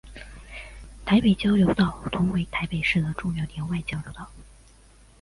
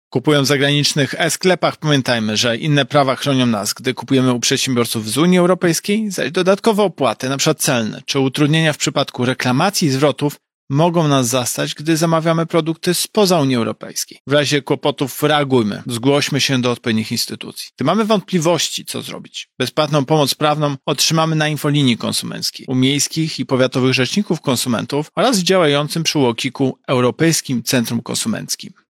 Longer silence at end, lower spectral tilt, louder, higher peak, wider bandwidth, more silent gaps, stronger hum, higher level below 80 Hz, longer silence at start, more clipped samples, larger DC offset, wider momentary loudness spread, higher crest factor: first, 0.8 s vs 0.2 s; first, -7 dB/octave vs -4.5 dB/octave; second, -24 LUFS vs -16 LUFS; second, -8 dBFS vs -2 dBFS; second, 11.5 kHz vs 16.5 kHz; second, none vs 10.54-10.68 s, 14.20-14.25 s; neither; first, -44 dBFS vs -62 dBFS; about the same, 0.05 s vs 0.1 s; neither; neither; first, 22 LU vs 7 LU; about the same, 18 dB vs 14 dB